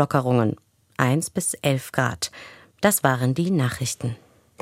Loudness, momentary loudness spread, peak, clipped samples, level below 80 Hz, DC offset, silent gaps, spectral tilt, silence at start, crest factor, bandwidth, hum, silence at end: -23 LUFS; 12 LU; -2 dBFS; under 0.1%; -56 dBFS; under 0.1%; none; -5 dB/octave; 0 s; 22 dB; 16.5 kHz; none; 0.45 s